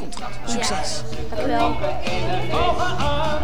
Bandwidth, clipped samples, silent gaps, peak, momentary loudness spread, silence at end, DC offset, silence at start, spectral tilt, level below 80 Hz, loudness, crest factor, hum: over 20 kHz; under 0.1%; none; -6 dBFS; 8 LU; 0 s; 9%; 0 s; -4.5 dB/octave; -34 dBFS; -24 LUFS; 16 dB; none